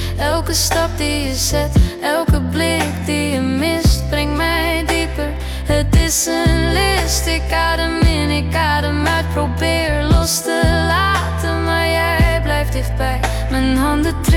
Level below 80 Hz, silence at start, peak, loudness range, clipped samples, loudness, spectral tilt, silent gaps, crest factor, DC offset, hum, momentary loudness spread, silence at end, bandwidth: -22 dBFS; 0 s; -2 dBFS; 1 LU; under 0.1%; -16 LUFS; -4.5 dB/octave; none; 12 dB; under 0.1%; none; 4 LU; 0 s; 18 kHz